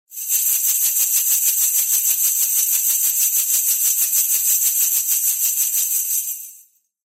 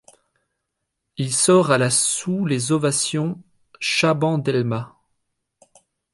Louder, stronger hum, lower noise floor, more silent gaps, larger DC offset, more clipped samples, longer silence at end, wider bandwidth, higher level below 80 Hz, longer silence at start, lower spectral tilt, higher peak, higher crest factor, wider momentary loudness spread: first, -15 LUFS vs -20 LUFS; neither; second, -51 dBFS vs -79 dBFS; neither; neither; neither; second, 0.6 s vs 1.25 s; first, 16.5 kHz vs 11.5 kHz; second, under -90 dBFS vs -64 dBFS; second, 0.1 s vs 1.2 s; second, 7 dB/octave vs -4 dB/octave; about the same, -4 dBFS vs -2 dBFS; about the same, 16 dB vs 20 dB; second, 3 LU vs 13 LU